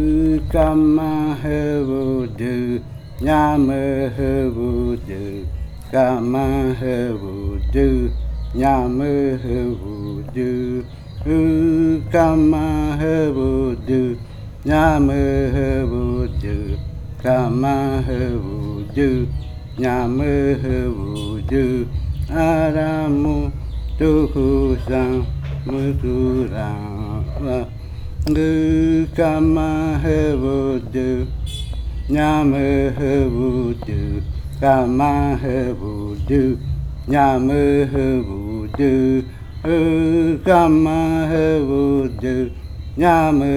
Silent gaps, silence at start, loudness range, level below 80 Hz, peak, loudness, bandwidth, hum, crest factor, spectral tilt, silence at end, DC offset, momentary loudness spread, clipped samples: none; 0 s; 4 LU; -28 dBFS; -2 dBFS; -19 LUFS; 13 kHz; none; 16 dB; -8.5 dB/octave; 0 s; under 0.1%; 11 LU; under 0.1%